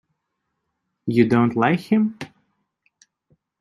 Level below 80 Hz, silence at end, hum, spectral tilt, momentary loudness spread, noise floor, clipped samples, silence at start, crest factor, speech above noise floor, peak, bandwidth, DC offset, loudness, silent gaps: -62 dBFS; 1.35 s; none; -8 dB/octave; 18 LU; -77 dBFS; under 0.1%; 1.05 s; 20 dB; 59 dB; -2 dBFS; 11.5 kHz; under 0.1%; -19 LUFS; none